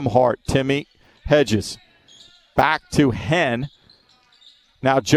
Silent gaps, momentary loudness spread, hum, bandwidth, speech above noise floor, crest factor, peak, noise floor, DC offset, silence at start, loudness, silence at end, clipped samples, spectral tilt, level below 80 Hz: none; 12 LU; none; 14 kHz; 37 dB; 18 dB; -2 dBFS; -56 dBFS; under 0.1%; 0 s; -20 LUFS; 0 s; under 0.1%; -5.5 dB/octave; -44 dBFS